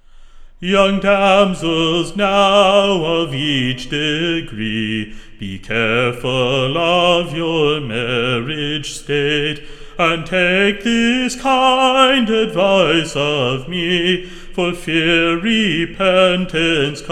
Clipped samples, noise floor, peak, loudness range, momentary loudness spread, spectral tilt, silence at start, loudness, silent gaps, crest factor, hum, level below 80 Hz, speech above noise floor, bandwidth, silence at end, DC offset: under 0.1%; -37 dBFS; 0 dBFS; 4 LU; 9 LU; -4.5 dB/octave; 0.2 s; -15 LUFS; none; 16 dB; none; -38 dBFS; 22 dB; 13.5 kHz; 0 s; under 0.1%